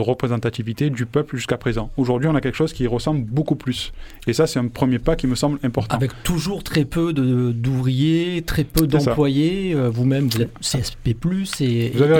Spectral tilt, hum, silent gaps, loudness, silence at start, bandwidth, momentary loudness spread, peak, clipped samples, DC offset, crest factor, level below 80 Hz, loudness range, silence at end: -6 dB/octave; none; none; -21 LUFS; 0 s; 18.5 kHz; 5 LU; 0 dBFS; under 0.1%; under 0.1%; 20 dB; -36 dBFS; 2 LU; 0 s